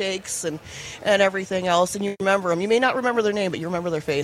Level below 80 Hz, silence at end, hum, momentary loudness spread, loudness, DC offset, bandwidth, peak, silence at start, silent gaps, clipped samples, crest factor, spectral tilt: -58 dBFS; 0 s; none; 8 LU; -22 LUFS; under 0.1%; 15.5 kHz; -6 dBFS; 0 s; none; under 0.1%; 18 dB; -4 dB/octave